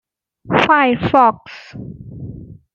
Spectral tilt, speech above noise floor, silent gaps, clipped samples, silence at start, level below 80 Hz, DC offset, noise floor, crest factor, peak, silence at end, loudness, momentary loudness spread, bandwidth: -6.5 dB/octave; 19 dB; none; under 0.1%; 0.45 s; -46 dBFS; under 0.1%; -34 dBFS; 16 dB; -2 dBFS; 0.2 s; -14 LUFS; 21 LU; 7.4 kHz